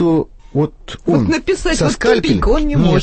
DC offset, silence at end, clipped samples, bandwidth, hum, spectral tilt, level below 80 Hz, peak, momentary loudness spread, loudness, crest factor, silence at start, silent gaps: under 0.1%; 0 s; under 0.1%; 8.8 kHz; none; -6 dB/octave; -24 dBFS; 0 dBFS; 7 LU; -16 LUFS; 14 dB; 0 s; none